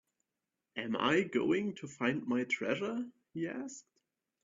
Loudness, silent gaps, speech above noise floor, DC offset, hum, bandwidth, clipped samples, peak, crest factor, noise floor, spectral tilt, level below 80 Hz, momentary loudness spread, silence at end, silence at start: -35 LUFS; none; 55 dB; under 0.1%; none; 7.6 kHz; under 0.1%; -18 dBFS; 20 dB; -89 dBFS; -4 dB/octave; -76 dBFS; 14 LU; 0.65 s; 0.75 s